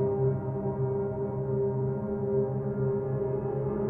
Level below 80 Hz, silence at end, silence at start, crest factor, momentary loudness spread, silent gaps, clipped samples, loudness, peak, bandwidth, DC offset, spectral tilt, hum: -52 dBFS; 0 s; 0 s; 12 dB; 3 LU; none; under 0.1%; -30 LUFS; -18 dBFS; 2.5 kHz; under 0.1%; -13.5 dB/octave; none